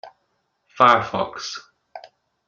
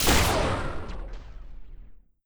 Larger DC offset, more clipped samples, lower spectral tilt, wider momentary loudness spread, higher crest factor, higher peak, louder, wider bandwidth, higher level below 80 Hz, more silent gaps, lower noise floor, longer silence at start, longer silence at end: neither; neither; about the same, -4 dB/octave vs -3.5 dB/octave; second, 17 LU vs 25 LU; first, 24 dB vs 18 dB; first, 0 dBFS vs -10 dBFS; first, -19 LUFS vs -26 LUFS; second, 7.6 kHz vs over 20 kHz; second, -62 dBFS vs -34 dBFS; neither; first, -71 dBFS vs -46 dBFS; about the same, 0.05 s vs 0 s; first, 0.5 s vs 0.3 s